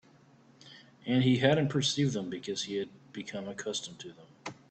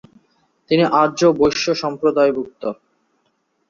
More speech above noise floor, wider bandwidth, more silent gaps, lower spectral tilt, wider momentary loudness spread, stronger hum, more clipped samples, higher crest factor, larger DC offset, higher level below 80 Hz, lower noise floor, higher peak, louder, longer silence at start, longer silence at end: second, 29 dB vs 50 dB; first, 9 kHz vs 7.4 kHz; neither; about the same, -5 dB/octave vs -5 dB/octave; first, 20 LU vs 14 LU; neither; neither; about the same, 22 dB vs 18 dB; neither; second, -68 dBFS vs -54 dBFS; second, -60 dBFS vs -67 dBFS; second, -10 dBFS vs -2 dBFS; second, -31 LUFS vs -17 LUFS; about the same, 0.65 s vs 0.7 s; second, 0.15 s vs 0.95 s